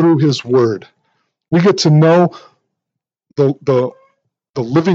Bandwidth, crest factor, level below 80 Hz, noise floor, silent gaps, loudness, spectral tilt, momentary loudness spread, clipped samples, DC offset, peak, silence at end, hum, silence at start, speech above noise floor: 7.8 kHz; 14 dB; -62 dBFS; -81 dBFS; 4.50-4.54 s; -14 LUFS; -7 dB/octave; 14 LU; under 0.1%; under 0.1%; 0 dBFS; 0 s; none; 0 s; 69 dB